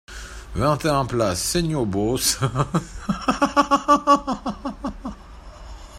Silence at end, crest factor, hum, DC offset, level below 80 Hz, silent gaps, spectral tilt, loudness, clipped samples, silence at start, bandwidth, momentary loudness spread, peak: 0 s; 20 dB; none; under 0.1%; -40 dBFS; none; -4.5 dB/octave; -21 LUFS; under 0.1%; 0.1 s; 16 kHz; 18 LU; -2 dBFS